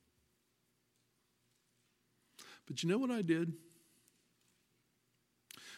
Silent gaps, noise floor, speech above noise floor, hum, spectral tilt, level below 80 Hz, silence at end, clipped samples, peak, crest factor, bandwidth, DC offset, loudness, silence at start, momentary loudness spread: none; -79 dBFS; 43 dB; 60 Hz at -65 dBFS; -5.5 dB/octave; -88 dBFS; 0 s; under 0.1%; -22 dBFS; 22 dB; 15.5 kHz; under 0.1%; -37 LUFS; 2.4 s; 22 LU